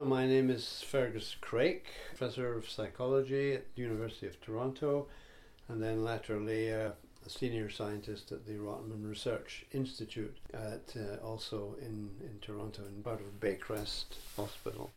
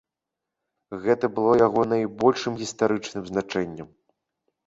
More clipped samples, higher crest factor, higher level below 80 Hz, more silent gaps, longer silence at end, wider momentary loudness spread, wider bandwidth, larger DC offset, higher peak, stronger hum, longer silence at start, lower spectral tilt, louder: neither; about the same, 18 dB vs 20 dB; about the same, -58 dBFS vs -60 dBFS; neither; second, 0.05 s vs 0.8 s; about the same, 12 LU vs 11 LU; first, 16 kHz vs 8 kHz; neither; second, -18 dBFS vs -4 dBFS; neither; second, 0 s vs 0.9 s; about the same, -6 dB/octave vs -5.5 dB/octave; second, -38 LUFS vs -24 LUFS